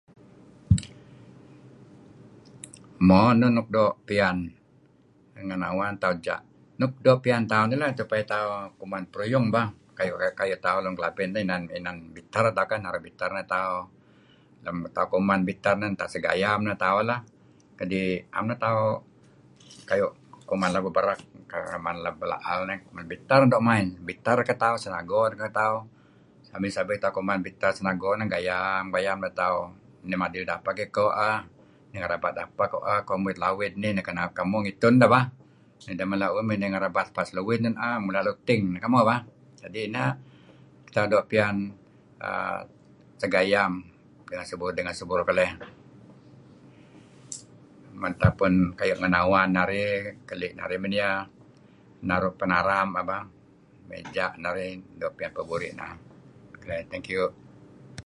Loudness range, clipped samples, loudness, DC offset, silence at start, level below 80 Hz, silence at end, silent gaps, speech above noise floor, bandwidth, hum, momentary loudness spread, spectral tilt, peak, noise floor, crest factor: 5 LU; under 0.1%; -26 LUFS; under 0.1%; 0.7 s; -52 dBFS; 0.05 s; none; 33 dB; 11.5 kHz; none; 14 LU; -6.5 dB/octave; -2 dBFS; -59 dBFS; 24 dB